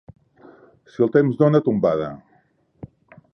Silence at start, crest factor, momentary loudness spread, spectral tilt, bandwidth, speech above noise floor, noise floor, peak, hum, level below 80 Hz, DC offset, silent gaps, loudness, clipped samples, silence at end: 1 s; 18 dB; 20 LU; -10 dB/octave; 6.2 kHz; 43 dB; -61 dBFS; -4 dBFS; none; -58 dBFS; under 0.1%; none; -19 LUFS; under 0.1%; 1.2 s